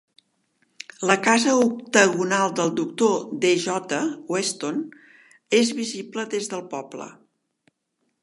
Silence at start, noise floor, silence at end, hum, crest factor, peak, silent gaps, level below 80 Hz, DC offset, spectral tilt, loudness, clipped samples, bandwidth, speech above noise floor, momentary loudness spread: 1 s; -74 dBFS; 1.1 s; none; 24 dB; 0 dBFS; none; -76 dBFS; under 0.1%; -3.5 dB/octave; -22 LUFS; under 0.1%; 11.5 kHz; 52 dB; 16 LU